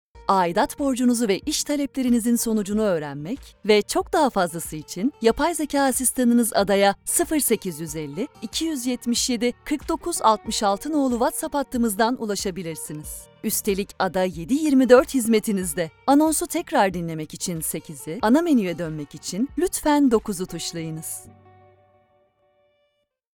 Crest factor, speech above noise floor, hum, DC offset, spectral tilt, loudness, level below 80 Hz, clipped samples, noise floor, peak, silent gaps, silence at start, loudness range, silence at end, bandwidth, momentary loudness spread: 22 dB; 50 dB; none; under 0.1%; -4 dB/octave; -22 LUFS; -48 dBFS; under 0.1%; -72 dBFS; 0 dBFS; none; 0.15 s; 5 LU; 2.1 s; 19.5 kHz; 12 LU